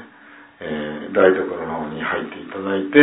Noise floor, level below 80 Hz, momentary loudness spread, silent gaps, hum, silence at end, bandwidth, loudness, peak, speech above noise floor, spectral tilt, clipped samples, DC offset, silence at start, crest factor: -46 dBFS; -58 dBFS; 13 LU; none; none; 0 s; 4 kHz; -21 LUFS; 0 dBFS; 28 dB; -10 dB/octave; under 0.1%; under 0.1%; 0 s; 20 dB